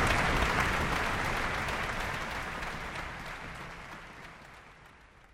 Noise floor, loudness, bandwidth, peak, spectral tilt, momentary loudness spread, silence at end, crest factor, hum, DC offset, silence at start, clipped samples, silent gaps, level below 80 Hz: -56 dBFS; -32 LUFS; 16 kHz; -12 dBFS; -4 dB/octave; 20 LU; 0.15 s; 20 dB; none; under 0.1%; 0 s; under 0.1%; none; -42 dBFS